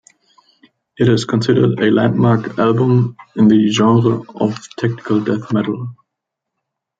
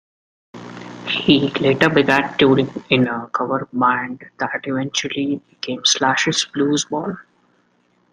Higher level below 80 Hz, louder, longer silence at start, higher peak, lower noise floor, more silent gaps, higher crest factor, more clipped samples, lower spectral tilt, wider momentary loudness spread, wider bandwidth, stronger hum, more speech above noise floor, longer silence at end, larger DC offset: about the same, -54 dBFS vs -56 dBFS; first, -15 LUFS vs -18 LUFS; first, 1 s vs 0.55 s; about the same, 0 dBFS vs 0 dBFS; first, -79 dBFS vs -61 dBFS; neither; about the same, 16 dB vs 20 dB; neither; first, -7 dB/octave vs -4 dB/octave; second, 9 LU vs 14 LU; second, 7.8 kHz vs 10.5 kHz; neither; first, 65 dB vs 43 dB; first, 1.05 s vs 0.9 s; neither